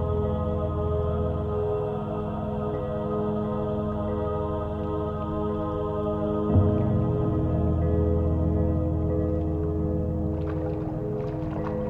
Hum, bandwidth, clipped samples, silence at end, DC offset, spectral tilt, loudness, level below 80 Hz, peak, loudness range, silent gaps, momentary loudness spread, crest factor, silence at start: none; 3.9 kHz; under 0.1%; 0 s; under 0.1%; -11 dB/octave; -27 LUFS; -36 dBFS; -10 dBFS; 4 LU; none; 6 LU; 16 dB; 0 s